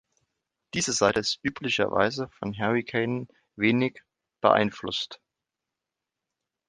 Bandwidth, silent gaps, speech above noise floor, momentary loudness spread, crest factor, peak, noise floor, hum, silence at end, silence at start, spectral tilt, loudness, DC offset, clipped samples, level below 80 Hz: 11 kHz; none; 61 dB; 11 LU; 24 dB; -4 dBFS; -87 dBFS; none; 1.55 s; 0.75 s; -4 dB/octave; -26 LUFS; under 0.1%; under 0.1%; -60 dBFS